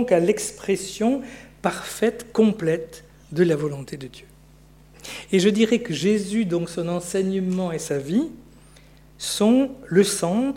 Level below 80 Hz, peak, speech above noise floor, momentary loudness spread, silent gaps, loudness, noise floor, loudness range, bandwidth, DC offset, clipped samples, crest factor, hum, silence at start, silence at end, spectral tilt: -54 dBFS; -6 dBFS; 28 dB; 14 LU; none; -23 LUFS; -50 dBFS; 2 LU; 16.5 kHz; under 0.1%; under 0.1%; 18 dB; 60 Hz at -55 dBFS; 0 s; 0 s; -5 dB/octave